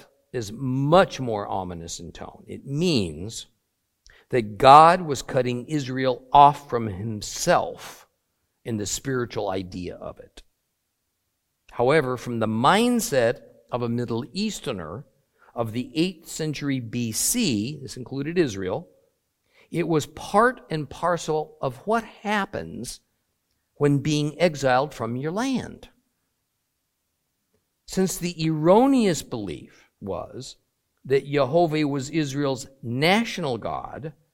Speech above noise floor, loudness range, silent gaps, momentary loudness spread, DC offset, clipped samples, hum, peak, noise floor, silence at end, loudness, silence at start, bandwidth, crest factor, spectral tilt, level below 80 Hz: 53 dB; 9 LU; none; 17 LU; under 0.1%; under 0.1%; none; 0 dBFS; -76 dBFS; 0.25 s; -23 LUFS; 0.35 s; 16.5 kHz; 24 dB; -5 dB/octave; -54 dBFS